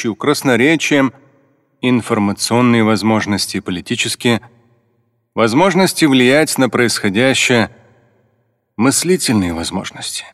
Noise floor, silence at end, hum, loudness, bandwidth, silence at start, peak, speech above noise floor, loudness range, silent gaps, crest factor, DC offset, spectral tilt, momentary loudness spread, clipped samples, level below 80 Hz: -63 dBFS; 0.05 s; none; -14 LUFS; 14.5 kHz; 0 s; -2 dBFS; 49 dB; 3 LU; none; 14 dB; under 0.1%; -4 dB/octave; 9 LU; under 0.1%; -52 dBFS